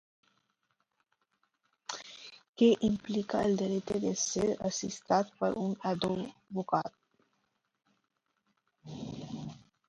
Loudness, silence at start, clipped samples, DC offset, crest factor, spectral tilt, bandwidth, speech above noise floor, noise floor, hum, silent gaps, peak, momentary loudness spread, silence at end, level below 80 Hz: -32 LUFS; 1.9 s; under 0.1%; under 0.1%; 20 dB; -5 dB/octave; 11 kHz; 49 dB; -80 dBFS; none; 2.49-2.53 s; -14 dBFS; 17 LU; 0.3 s; -64 dBFS